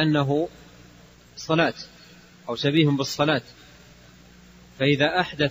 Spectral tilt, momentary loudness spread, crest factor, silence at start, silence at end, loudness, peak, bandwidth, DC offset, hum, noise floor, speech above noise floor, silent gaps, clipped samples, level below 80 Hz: -5.5 dB/octave; 19 LU; 20 dB; 0 s; 0 s; -23 LUFS; -6 dBFS; 15.5 kHz; under 0.1%; 60 Hz at -55 dBFS; -51 dBFS; 28 dB; none; under 0.1%; -56 dBFS